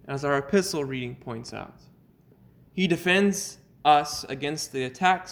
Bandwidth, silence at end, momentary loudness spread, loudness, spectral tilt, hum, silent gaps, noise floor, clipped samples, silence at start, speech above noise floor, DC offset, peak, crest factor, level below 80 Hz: over 20 kHz; 0 s; 16 LU; -25 LUFS; -4 dB/octave; none; none; -57 dBFS; under 0.1%; 0.05 s; 32 dB; under 0.1%; -6 dBFS; 20 dB; -60 dBFS